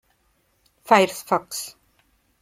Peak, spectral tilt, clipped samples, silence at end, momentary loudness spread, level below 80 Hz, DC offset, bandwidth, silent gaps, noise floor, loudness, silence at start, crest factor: 0 dBFS; -3.5 dB/octave; under 0.1%; 0.7 s; 14 LU; -68 dBFS; under 0.1%; 16.5 kHz; none; -66 dBFS; -21 LUFS; 0.9 s; 24 dB